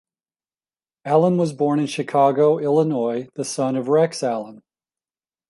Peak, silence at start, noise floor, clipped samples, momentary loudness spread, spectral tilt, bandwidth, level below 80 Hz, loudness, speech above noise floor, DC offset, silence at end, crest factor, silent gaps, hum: -4 dBFS; 1.05 s; under -90 dBFS; under 0.1%; 10 LU; -6.5 dB/octave; 11.5 kHz; -72 dBFS; -20 LUFS; over 71 dB; under 0.1%; 0.9 s; 18 dB; none; none